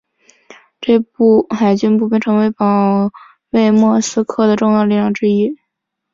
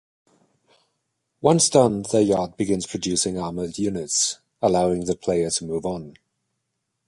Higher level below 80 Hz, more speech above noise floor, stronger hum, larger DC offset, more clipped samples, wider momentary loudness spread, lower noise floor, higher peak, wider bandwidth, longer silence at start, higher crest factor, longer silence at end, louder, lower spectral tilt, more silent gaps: about the same, -56 dBFS vs -52 dBFS; first, 62 dB vs 56 dB; neither; neither; neither; second, 6 LU vs 10 LU; about the same, -75 dBFS vs -78 dBFS; about the same, -2 dBFS vs -2 dBFS; second, 7.6 kHz vs 11.5 kHz; second, 0.8 s vs 1.45 s; second, 12 dB vs 22 dB; second, 0.6 s vs 1 s; first, -14 LUFS vs -22 LUFS; first, -6.5 dB/octave vs -4.5 dB/octave; neither